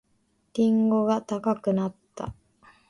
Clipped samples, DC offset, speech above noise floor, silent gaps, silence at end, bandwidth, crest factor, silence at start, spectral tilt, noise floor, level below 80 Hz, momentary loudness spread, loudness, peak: under 0.1%; under 0.1%; 45 dB; none; 0.6 s; 10.5 kHz; 16 dB; 0.55 s; -8 dB/octave; -69 dBFS; -58 dBFS; 16 LU; -25 LUFS; -10 dBFS